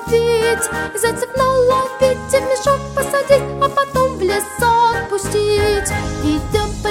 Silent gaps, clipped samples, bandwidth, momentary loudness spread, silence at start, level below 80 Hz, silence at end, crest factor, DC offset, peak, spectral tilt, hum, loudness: none; under 0.1%; 17 kHz; 5 LU; 0 s; -34 dBFS; 0 s; 16 dB; under 0.1%; 0 dBFS; -4 dB/octave; none; -16 LUFS